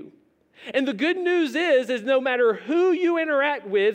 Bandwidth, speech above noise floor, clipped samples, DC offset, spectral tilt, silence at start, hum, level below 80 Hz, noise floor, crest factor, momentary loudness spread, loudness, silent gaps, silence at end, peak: 9.6 kHz; 36 dB; under 0.1%; under 0.1%; -4.5 dB/octave; 0 s; none; -82 dBFS; -57 dBFS; 14 dB; 5 LU; -22 LUFS; none; 0 s; -10 dBFS